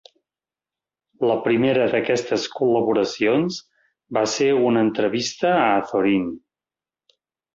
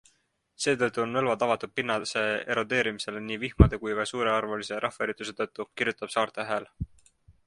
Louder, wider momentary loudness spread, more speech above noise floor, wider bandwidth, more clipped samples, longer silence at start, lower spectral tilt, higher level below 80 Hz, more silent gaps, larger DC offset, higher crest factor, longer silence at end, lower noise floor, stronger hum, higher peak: first, -20 LUFS vs -28 LUFS; second, 7 LU vs 10 LU; first, over 70 dB vs 43 dB; second, 7.8 kHz vs 11.5 kHz; neither; first, 1.2 s vs 0.6 s; about the same, -5 dB/octave vs -5 dB/octave; second, -62 dBFS vs -38 dBFS; neither; neither; second, 16 dB vs 26 dB; first, 1.15 s vs 0.15 s; first, under -90 dBFS vs -71 dBFS; neither; about the same, -4 dBFS vs -2 dBFS